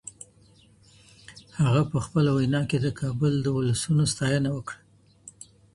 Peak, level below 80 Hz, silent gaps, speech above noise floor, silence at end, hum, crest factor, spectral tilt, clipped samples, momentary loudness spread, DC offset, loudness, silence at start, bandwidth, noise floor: -10 dBFS; -52 dBFS; none; 33 dB; 0.45 s; none; 18 dB; -6 dB/octave; under 0.1%; 20 LU; under 0.1%; -25 LUFS; 0.05 s; 11.5 kHz; -57 dBFS